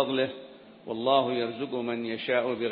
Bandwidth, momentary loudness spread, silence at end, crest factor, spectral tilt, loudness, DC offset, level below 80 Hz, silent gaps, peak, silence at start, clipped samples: 5.2 kHz; 18 LU; 0 s; 20 dB; -9 dB/octave; -29 LUFS; under 0.1%; -76 dBFS; none; -10 dBFS; 0 s; under 0.1%